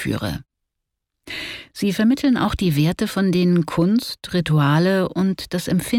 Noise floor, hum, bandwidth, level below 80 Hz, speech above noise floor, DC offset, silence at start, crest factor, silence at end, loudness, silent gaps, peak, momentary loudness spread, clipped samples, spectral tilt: -80 dBFS; none; 17 kHz; -44 dBFS; 61 dB; under 0.1%; 0 s; 14 dB; 0 s; -20 LUFS; none; -6 dBFS; 12 LU; under 0.1%; -6.5 dB/octave